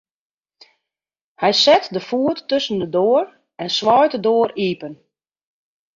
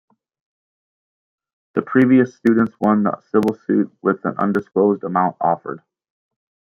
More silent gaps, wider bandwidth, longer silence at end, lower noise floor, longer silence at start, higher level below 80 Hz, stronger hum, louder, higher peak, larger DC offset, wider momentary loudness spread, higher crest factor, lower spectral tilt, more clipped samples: neither; first, 7.6 kHz vs 6.8 kHz; about the same, 1 s vs 0.95 s; about the same, -89 dBFS vs under -90 dBFS; second, 1.4 s vs 1.75 s; about the same, -64 dBFS vs -64 dBFS; neither; about the same, -17 LUFS vs -18 LUFS; about the same, -2 dBFS vs -2 dBFS; neither; first, 12 LU vs 9 LU; about the same, 18 dB vs 18 dB; second, -4 dB/octave vs -9 dB/octave; neither